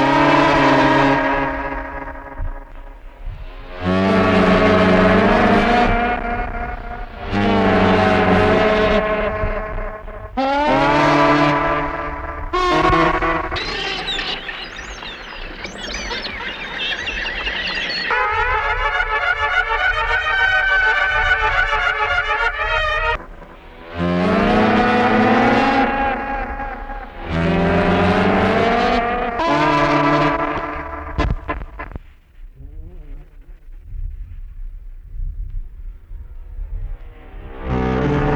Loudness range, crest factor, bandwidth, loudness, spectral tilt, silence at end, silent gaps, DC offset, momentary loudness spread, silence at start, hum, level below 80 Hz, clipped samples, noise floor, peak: 14 LU; 16 dB; 10 kHz; -17 LUFS; -6 dB/octave; 0 s; none; under 0.1%; 19 LU; 0 s; none; -30 dBFS; under 0.1%; -40 dBFS; -2 dBFS